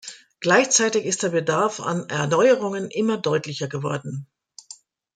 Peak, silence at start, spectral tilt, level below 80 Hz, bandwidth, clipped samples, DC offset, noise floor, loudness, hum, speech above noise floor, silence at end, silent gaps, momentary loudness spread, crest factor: -4 dBFS; 0.05 s; -3.5 dB/octave; -68 dBFS; 10 kHz; under 0.1%; under 0.1%; -48 dBFS; -21 LUFS; none; 26 dB; 0.4 s; none; 15 LU; 18 dB